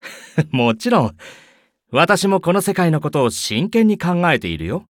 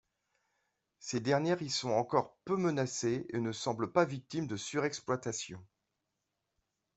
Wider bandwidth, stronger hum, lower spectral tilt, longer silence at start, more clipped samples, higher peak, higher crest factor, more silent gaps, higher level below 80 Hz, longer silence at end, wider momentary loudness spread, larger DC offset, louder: first, 17.5 kHz vs 8.2 kHz; neither; about the same, -5.5 dB/octave vs -4.5 dB/octave; second, 0.05 s vs 1 s; neither; first, -2 dBFS vs -12 dBFS; second, 16 dB vs 22 dB; neither; first, -48 dBFS vs -72 dBFS; second, 0.05 s vs 1.35 s; about the same, 7 LU vs 8 LU; neither; first, -17 LUFS vs -34 LUFS